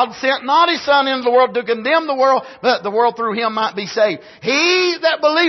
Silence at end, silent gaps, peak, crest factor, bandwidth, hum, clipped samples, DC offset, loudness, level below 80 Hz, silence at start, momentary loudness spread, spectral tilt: 0 s; none; -2 dBFS; 14 dB; 6.2 kHz; none; under 0.1%; under 0.1%; -16 LUFS; -66 dBFS; 0 s; 5 LU; -3 dB/octave